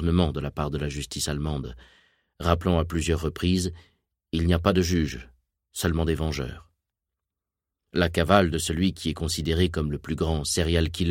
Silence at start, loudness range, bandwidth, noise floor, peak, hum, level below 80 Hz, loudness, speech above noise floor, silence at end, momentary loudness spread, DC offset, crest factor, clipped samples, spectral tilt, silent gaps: 0 s; 3 LU; 16.5 kHz; -87 dBFS; -2 dBFS; none; -36 dBFS; -26 LUFS; 62 dB; 0 s; 10 LU; under 0.1%; 24 dB; under 0.1%; -5.5 dB/octave; none